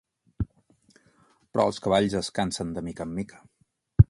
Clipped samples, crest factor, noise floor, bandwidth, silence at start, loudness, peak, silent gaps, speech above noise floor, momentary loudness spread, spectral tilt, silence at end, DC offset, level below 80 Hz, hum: under 0.1%; 26 dB; -69 dBFS; 11.5 kHz; 0.4 s; -28 LUFS; 0 dBFS; none; 42 dB; 12 LU; -6.5 dB/octave; 0.05 s; under 0.1%; -38 dBFS; none